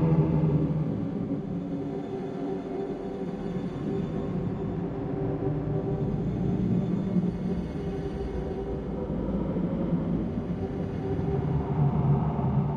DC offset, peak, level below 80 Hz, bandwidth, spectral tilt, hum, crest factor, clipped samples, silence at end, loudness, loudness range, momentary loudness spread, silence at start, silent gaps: under 0.1%; -12 dBFS; -42 dBFS; 6.6 kHz; -10.5 dB/octave; none; 16 dB; under 0.1%; 0 s; -29 LUFS; 4 LU; 8 LU; 0 s; none